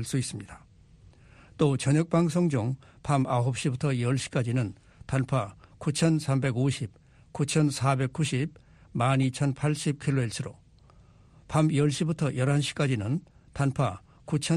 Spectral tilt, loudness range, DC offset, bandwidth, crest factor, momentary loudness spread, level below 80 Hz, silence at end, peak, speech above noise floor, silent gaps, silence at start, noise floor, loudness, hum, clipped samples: -6 dB/octave; 2 LU; under 0.1%; 13 kHz; 18 dB; 11 LU; -56 dBFS; 0 s; -10 dBFS; 29 dB; none; 0 s; -56 dBFS; -28 LUFS; none; under 0.1%